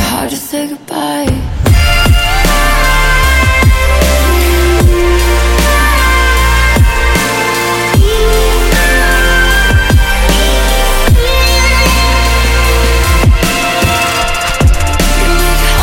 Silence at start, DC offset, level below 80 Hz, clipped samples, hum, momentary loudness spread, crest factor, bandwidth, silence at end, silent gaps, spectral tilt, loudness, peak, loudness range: 0 s; under 0.1%; -12 dBFS; under 0.1%; none; 4 LU; 8 dB; 17 kHz; 0 s; none; -4 dB/octave; -10 LUFS; 0 dBFS; 1 LU